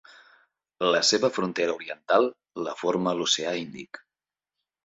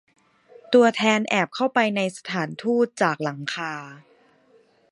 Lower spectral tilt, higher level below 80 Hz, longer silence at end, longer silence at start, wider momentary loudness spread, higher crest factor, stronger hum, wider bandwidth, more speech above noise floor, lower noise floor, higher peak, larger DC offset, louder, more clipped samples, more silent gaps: second, -3 dB/octave vs -4.5 dB/octave; about the same, -70 dBFS vs -74 dBFS; about the same, 0.9 s vs 0.95 s; about the same, 0.8 s vs 0.7 s; first, 16 LU vs 11 LU; about the same, 20 dB vs 20 dB; neither; second, 8.2 kHz vs 11.5 kHz; first, over 64 dB vs 36 dB; first, under -90 dBFS vs -59 dBFS; second, -8 dBFS vs -4 dBFS; neither; second, -25 LUFS vs -22 LUFS; neither; neither